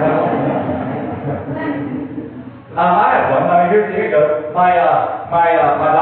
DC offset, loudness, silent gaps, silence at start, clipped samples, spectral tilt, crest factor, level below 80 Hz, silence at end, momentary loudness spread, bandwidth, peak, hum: under 0.1%; -15 LUFS; none; 0 s; under 0.1%; -11 dB/octave; 12 dB; -54 dBFS; 0 s; 12 LU; 4.3 kHz; -2 dBFS; none